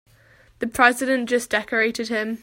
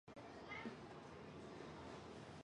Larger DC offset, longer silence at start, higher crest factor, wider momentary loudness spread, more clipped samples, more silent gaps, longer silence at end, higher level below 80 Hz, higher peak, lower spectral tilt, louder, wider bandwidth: neither; first, 0.6 s vs 0.05 s; about the same, 22 dB vs 18 dB; first, 9 LU vs 5 LU; neither; neither; about the same, 0.05 s vs 0 s; first, -56 dBFS vs -72 dBFS; first, -2 dBFS vs -38 dBFS; second, -3 dB/octave vs -5.5 dB/octave; first, -21 LUFS vs -55 LUFS; first, 16.5 kHz vs 10.5 kHz